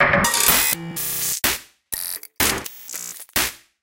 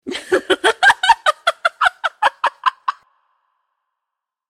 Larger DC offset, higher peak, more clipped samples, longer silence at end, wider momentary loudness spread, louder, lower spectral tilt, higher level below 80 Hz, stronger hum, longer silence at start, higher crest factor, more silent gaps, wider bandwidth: neither; about the same, 0 dBFS vs 0 dBFS; neither; second, 0.25 s vs 1.6 s; first, 15 LU vs 8 LU; second, -20 LUFS vs -16 LUFS; about the same, -1.5 dB/octave vs -1 dB/octave; first, -44 dBFS vs -56 dBFS; neither; about the same, 0 s vs 0.05 s; about the same, 22 dB vs 18 dB; neither; first, 17.5 kHz vs 15.5 kHz